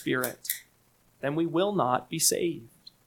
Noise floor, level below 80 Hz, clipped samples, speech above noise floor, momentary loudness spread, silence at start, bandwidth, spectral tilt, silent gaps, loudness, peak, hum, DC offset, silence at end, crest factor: -65 dBFS; -68 dBFS; under 0.1%; 37 dB; 11 LU; 0 s; 19 kHz; -3.5 dB/octave; none; -28 LUFS; -6 dBFS; none; under 0.1%; 0.4 s; 24 dB